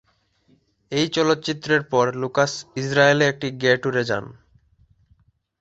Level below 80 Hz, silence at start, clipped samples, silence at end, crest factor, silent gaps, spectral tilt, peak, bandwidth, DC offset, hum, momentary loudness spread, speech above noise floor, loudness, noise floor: -60 dBFS; 0.9 s; under 0.1%; 1.3 s; 20 dB; none; -4.5 dB/octave; -2 dBFS; 8.2 kHz; under 0.1%; none; 8 LU; 42 dB; -21 LUFS; -63 dBFS